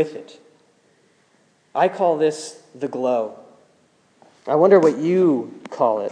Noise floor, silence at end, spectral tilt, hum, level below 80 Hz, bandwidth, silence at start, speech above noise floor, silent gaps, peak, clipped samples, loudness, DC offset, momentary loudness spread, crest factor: -60 dBFS; 0 s; -6.5 dB/octave; none; -84 dBFS; 10 kHz; 0 s; 41 dB; none; -2 dBFS; under 0.1%; -19 LUFS; under 0.1%; 19 LU; 18 dB